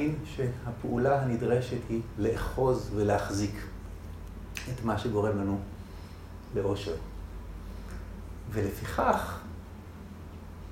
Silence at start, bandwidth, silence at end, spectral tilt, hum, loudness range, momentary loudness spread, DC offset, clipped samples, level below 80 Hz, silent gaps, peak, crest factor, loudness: 0 s; 16 kHz; 0 s; -6.5 dB/octave; none; 6 LU; 17 LU; under 0.1%; under 0.1%; -44 dBFS; none; -10 dBFS; 22 dB; -31 LUFS